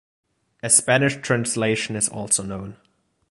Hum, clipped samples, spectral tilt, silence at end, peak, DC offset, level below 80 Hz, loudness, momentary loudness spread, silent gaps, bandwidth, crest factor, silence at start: none; under 0.1%; -3 dB/octave; 0.55 s; -2 dBFS; under 0.1%; -56 dBFS; -20 LUFS; 17 LU; none; 12 kHz; 22 dB; 0.65 s